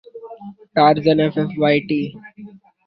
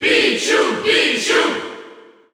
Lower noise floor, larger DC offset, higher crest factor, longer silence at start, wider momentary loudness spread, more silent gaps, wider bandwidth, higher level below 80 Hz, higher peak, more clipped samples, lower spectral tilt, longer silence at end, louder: about the same, -41 dBFS vs -42 dBFS; neither; about the same, 18 dB vs 16 dB; first, 0.15 s vs 0 s; first, 23 LU vs 14 LU; neither; second, 6 kHz vs 16 kHz; about the same, -58 dBFS vs -60 dBFS; about the same, -2 dBFS vs -2 dBFS; neither; first, -9 dB/octave vs -1.5 dB/octave; about the same, 0.4 s vs 0.35 s; about the same, -17 LUFS vs -15 LUFS